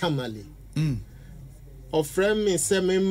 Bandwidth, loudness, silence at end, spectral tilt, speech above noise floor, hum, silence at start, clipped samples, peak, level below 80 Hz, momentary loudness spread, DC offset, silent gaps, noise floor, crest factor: 16 kHz; -25 LUFS; 0 s; -4.5 dB/octave; 20 dB; none; 0 s; under 0.1%; -12 dBFS; -46 dBFS; 23 LU; under 0.1%; none; -44 dBFS; 14 dB